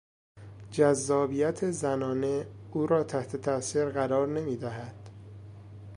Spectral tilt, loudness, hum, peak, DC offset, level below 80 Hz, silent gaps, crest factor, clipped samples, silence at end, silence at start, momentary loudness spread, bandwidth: -6 dB/octave; -29 LUFS; none; -10 dBFS; under 0.1%; -60 dBFS; none; 20 dB; under 0.1%; 0 s; 0.35 s; 22 LU; 11.5 kHz